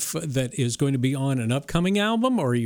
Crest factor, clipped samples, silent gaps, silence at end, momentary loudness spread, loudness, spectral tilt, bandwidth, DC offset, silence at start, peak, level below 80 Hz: 14 dB; under 0.1%; none; 0 s; 4 LU; -24 LUFS; -5.5 dB/octave; 20 kHz; under 0.1%; 0 s; -10 dBFS; -48 dBFS